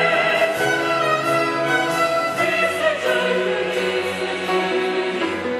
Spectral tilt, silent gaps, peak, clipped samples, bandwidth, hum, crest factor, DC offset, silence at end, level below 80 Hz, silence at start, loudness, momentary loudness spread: -4 dB/octave; none; -6 dBFS; under 0.1%; 13 kHz; none; 14 dB; under 0.1%; 0 s; -62 dBFS; 0 s; -19 LUFS; 4 LU